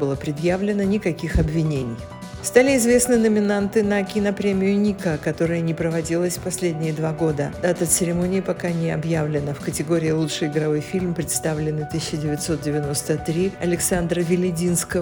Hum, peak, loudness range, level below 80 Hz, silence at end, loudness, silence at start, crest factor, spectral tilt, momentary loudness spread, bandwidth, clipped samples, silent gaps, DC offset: none; -2 dBFS; 4 LU; -40 dBFS; 0 s; -21 LUFS; 0 s; 20 dB; -5.5 dB/octave; 7 LU; over 20 kHz; under 0.1%; none; under 0.1%